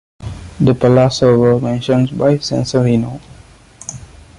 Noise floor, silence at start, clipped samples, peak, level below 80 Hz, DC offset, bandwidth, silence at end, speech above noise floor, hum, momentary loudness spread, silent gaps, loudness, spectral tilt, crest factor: -41 dBFS; 0.2 s; under 0.1%; -2 dBFS; -40 dBFS; under 0.1%; 11 kHz; 0.35 s; 28 dB; none; 19 LU; none; -13 LUFS; -7 dB/octave; 14 dB